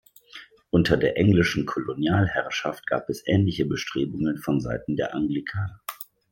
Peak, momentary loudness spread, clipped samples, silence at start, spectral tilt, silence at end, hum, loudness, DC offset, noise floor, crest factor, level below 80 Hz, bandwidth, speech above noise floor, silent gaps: -4 dBFS; 16 LU; under 0.1%; 0.35 s; -6.5 dB/octave; 0.3 s; none; -25 LUFS; under 0.1%; -48 dBFS; 20 dB; -50 dBFS; 17 kHz; 24 dB; none